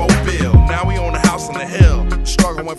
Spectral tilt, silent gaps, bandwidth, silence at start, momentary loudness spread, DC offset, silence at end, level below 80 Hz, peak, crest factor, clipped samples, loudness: -5.5 dB/octave; none; 12.5 kHz; 0 s; 7 LU; under 0.1%; 0 s; -18 dBFS; 0 dBFS; 14 dB; under 0.1%; -15 LUFS